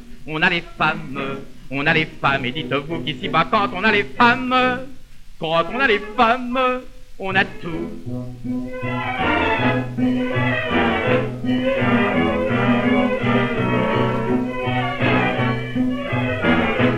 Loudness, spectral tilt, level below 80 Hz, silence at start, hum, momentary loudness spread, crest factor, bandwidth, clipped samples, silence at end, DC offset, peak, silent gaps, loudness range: -20 LUFS; -7 dB/octave; -40 dBFS; 0 s; none; 11 LU; 18 dB; 9.8 kHz; under 0.1%; 0 s; under 0.1%; -2 dBFS; none; 3 LU